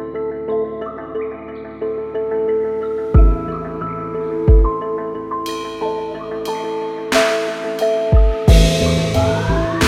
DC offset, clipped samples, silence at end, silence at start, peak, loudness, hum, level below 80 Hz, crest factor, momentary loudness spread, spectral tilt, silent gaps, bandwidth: under 0.1%; under 0.1%; 0 s; 0 s; 0 dBFS; -18 LUFS; none; -20 dBFS; 16 dB; 12 LU; -6 dB/octave; none; 14 kHz